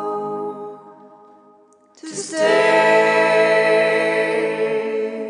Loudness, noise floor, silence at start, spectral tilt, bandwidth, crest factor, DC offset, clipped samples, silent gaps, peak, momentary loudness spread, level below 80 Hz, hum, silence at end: -17 LUFS; -52 dBFS; 0 s; -3.5 dB/octave; 10.5 kHz; 16 dB; under 0.1%; under 0.1%; none; -2 dBFS; 16 LU; -80 dBFS; none; 0 s